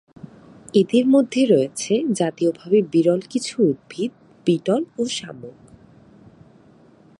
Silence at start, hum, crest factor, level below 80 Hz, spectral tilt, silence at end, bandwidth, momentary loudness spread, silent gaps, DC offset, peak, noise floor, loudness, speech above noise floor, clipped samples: 0.25 s; none; 18 dB; -66 dBFS; -5.5 dB/octave; 1.7 s; 11.5 kHz; 11 LU; none; under 0.1%; -4 dBFS; -51 dBFS; -20 LUFS; 32 dB; under 0.1%